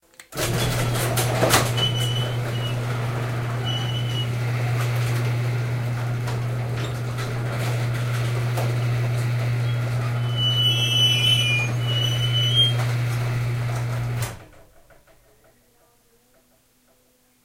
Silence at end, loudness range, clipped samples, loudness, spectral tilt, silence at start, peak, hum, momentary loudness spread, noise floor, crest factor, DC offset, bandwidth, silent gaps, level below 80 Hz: 2.8 s; 9 LU; under 0.1%; -22 LUFS; -4 dB/octave; 0.2 s; -4 dBFS; none; 9 LU; -61 dBFS; 20 dB; under 0.1%; 16 kHz; none; -46 dBFS